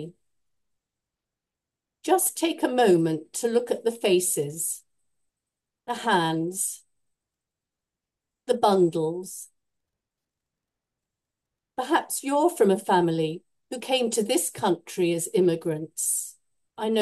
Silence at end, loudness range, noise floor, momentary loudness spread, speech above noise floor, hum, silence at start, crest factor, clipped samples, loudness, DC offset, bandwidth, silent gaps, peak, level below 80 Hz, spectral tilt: 0 s; 6 LU; -88 dBFS; 15 LU; 64 dB; none; 0 s; 20 dB; under 0.1%; -25 LUFS; under 0.1%; 12.5 kHz; none; -6 dBFS; -78 dBFS; -4 dB/octave